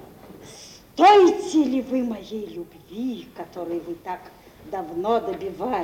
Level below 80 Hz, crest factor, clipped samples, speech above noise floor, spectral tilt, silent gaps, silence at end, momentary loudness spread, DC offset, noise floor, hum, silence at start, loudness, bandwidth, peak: -58 dBFS; 20 dB; under 0.1%; 23 dB; -4.5 dB/octave; none; 0 s; 23 LU; under 0.1%; -45 dBFS; none; 0 s; -22 LUFS; 16.5 kHz; -4 dBFS